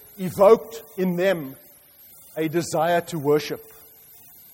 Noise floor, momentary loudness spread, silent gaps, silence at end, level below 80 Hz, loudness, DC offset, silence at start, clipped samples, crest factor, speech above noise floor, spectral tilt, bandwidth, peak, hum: -50 dBFS; 19 LU; none; 0.9 s; -62 dBFS; -22 LUFS; under 0.1%; 0.2 s; under 0.1%; 20 dB; 29 dB; -5.5 dB/octave; 16.5 kHz; -4 dBFS; none